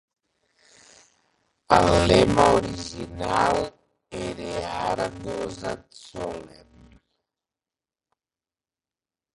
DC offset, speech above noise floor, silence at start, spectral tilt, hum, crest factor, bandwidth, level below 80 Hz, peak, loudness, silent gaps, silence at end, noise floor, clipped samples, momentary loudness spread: under 0.1%; over 68 dB; 1.7 s; -5 dB/octave; none; 24 dB; 11.5 kHz; -44 dBFS; -2 dBFS; -23 LUFS; none; 2.85 s; under -90 dBFS; under 0.1%; 17 LU